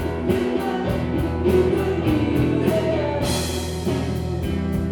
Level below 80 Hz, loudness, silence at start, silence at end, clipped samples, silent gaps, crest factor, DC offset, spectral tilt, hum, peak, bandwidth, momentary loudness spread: -34 dBFS; -22 LUFS; 0 s; 0 s; under 0.1%; none; 16 dB; under 0.1%; -6.5 dB/octave; none; -6 dBFS; 19.5 kHz; 6 LU